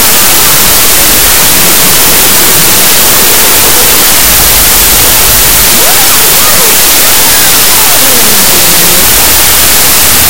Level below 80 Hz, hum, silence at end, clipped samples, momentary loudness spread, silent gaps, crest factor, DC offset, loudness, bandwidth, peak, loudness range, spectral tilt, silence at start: -22 dBFS; none; 0 s; 20%; 0 LU; none; 6 dB; 20%; -1 LUFS; over 20 kHz; 0 dBFS; 0 LU; -0.5 dB/octave; 0 s